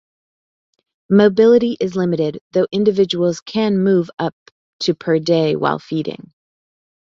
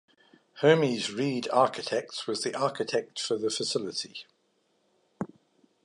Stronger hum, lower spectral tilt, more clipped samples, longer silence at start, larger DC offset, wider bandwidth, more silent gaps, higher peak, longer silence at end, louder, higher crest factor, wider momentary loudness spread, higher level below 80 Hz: neither; first, -6.5 dB/octave vs -4 dB/octave; neither; first, 1.1 s vs 0.55 s; neither; second, 7.6 kHz vs 11.5 kHz; first, 2.41-2.51 s, 3.42-3.46 s, 4.33-4.79 s vs none; first, -2 dBFS vs -8 dBFS; first, 1.05 s vs 0.6 s; first, -17 LUFS vs -28 LUFS; second, 16 dB vs 22 dB; second, 11 LU vs 17 LU; first, -60 dBFS vs -78 dBFS